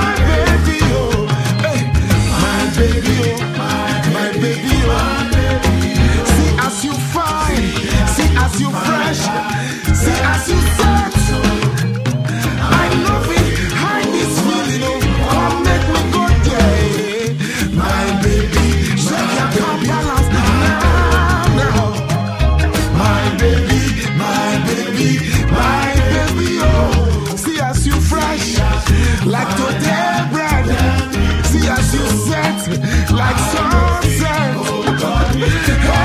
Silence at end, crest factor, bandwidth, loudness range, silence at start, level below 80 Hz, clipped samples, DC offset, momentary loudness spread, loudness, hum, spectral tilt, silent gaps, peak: 0 s; 14 dB; 15.5 kHz; 1 LU; 0 s; -20 dBFS; under 0.1%; under 0.1%; 4 LU; -15 LUFS; none; -5 dB/octave; none; 0 dBFS